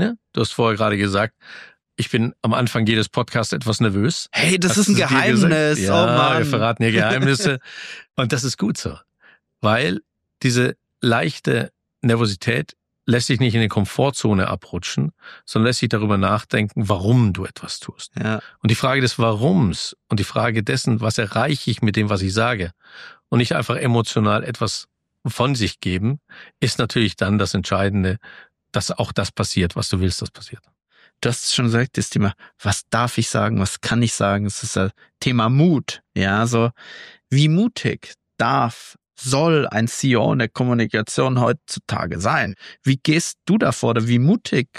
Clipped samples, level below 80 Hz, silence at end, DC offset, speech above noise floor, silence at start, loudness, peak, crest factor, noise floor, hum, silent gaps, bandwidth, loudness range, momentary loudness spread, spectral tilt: under 0.1%; -50 dBFS; 0 s; under 0.1%; 38 dB; 0 s; -20 LUFS; -4 dBFS; 16 dB; -57 dBFS; none; none; 14 kHz; 5 LU; 10 LU; -5 dB/octave